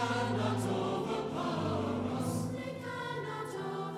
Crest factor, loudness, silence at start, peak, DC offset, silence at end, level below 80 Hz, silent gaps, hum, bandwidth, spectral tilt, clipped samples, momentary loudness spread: 14 dB; -35 LUFS; 0 s; -20 dBFS; under 0.1%; 0 s; -64 dBFS; none; none; 15.5 kHz; -6 dB/octave; under 0.1%; 6 LU